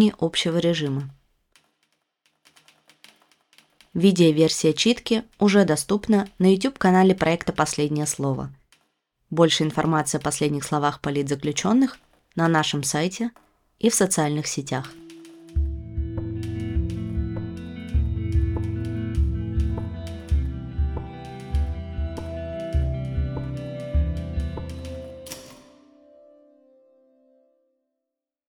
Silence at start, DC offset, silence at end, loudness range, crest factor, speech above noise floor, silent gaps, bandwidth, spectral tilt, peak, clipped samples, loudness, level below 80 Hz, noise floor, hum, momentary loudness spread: 0 s; under 0.1%; 2.9 s; 10 LU; 20 dB; 64 dB; none; 17.5 kHz; -5 dB/octave; -4 dBFS; under 0.1%; -24 LUFS; -34 dBFS; -85 dBFS; none; 14 LU